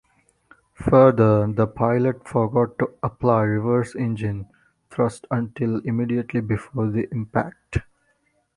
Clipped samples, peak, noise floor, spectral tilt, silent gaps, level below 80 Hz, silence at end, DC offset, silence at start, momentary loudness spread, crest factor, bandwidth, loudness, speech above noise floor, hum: under 0.1%; -2 dBFS; -67 dBFS; -9 dB/octave; none; -46 dBFS; 0.75 s; under 0.1%; 0.8 s; 12 LU; 20 dB; 11 kHz; -22 LUFS; 46 dB; none